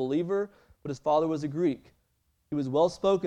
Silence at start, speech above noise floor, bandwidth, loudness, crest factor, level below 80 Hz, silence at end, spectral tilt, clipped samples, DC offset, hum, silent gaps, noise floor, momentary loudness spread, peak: 0 s; 45 dB; 10 kHz; -29 LUFS; 16 dB; -64 dBFS; 0 s; -7 dB/octave; under 0.1%; under 0.1%; none; none; -73 dBFS; 14 LU; -12 dBFS